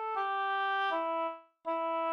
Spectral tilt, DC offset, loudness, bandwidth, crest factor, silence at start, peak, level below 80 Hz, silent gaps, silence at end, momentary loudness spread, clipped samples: -2.5 dB/octave; under 0.1%; -33 LUFS; 10 kHz; 12 dB; 0 s; -22 dBFS; -86 dBFS; none; 0 s; 7 LU; under 0.1%